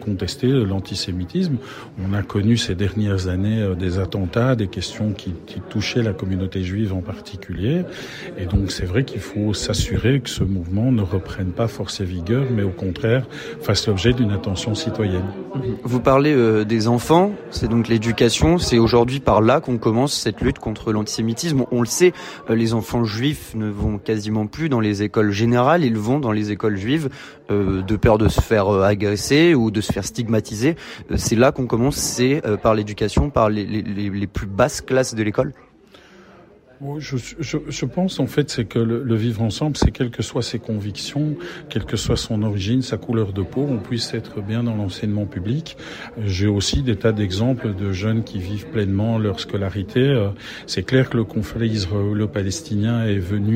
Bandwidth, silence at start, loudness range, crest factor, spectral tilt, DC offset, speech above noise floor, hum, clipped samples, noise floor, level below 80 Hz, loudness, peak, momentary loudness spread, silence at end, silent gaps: 16 kHz; 0 s; 6 LU; 16 dB; -6 dB/octave; under 0.1%; 28 dB; none; under 0.1%; -48 dBFS; -36 dBFS; -20 LUFS; -2 dBFS; 10 LU; 0 s; none